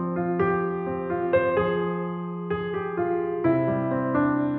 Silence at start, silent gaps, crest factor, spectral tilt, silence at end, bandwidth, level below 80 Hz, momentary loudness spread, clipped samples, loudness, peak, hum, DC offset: 0 s; none; 16 dB; -7 dB/octave; 0 s; 4.2 kHz; -56 dBFS; 6 LU; under 0.1%; -25 LUFS; -10 dBFS; none; under 0.1%